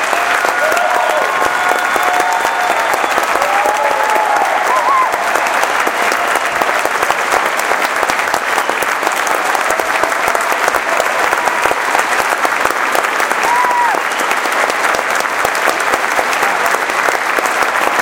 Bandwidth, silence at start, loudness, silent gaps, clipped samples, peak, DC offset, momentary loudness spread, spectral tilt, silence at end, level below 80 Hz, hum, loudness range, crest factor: 18 kHz; 0 s; -13 LUFS; none; under 0.1%; 0 dBFS; under 0.1%; 2 LU; -1 dB/octave; 0 s; -52 dBFS; none; 1 LU; 14 dB